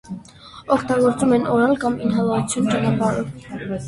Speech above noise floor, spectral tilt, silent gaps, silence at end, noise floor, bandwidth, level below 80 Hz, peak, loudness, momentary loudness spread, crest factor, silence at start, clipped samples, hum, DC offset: 22 dB; -6 dB/octave; none; 0 s; -41 dBFS; 11.5 kHz; -50 dBFS; -2 dBFS; -19 LUFS; 14 LU; 18 dB; 0.05 s; under 0.1%; none; under 0.1%